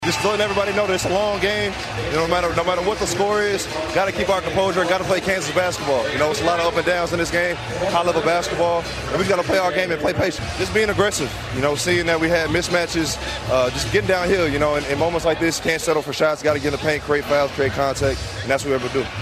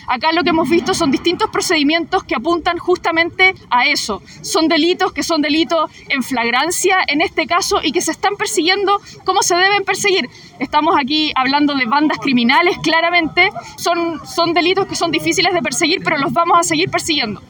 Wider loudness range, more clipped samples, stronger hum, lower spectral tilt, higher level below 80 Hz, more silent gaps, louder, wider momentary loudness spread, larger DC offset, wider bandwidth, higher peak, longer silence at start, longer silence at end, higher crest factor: about the same, 1 LU vs 1 LU; neither; neither; first, -4 dB/octave vs -2.5 dB/octave; first, -40 dBFS vs -48 dBFS; neither; second, -20 LUFS vs -15 LUFS; about the same, 4 LU vs 6 LU; neither; second, 15.5 kHz vs 19.5 kHz; second, -4 dBFS vs 0 dBFS; about the same, 0 s vs 0 s; about the same, 0 s vs 0.05 s; about the same, 16 dB vs 16 dB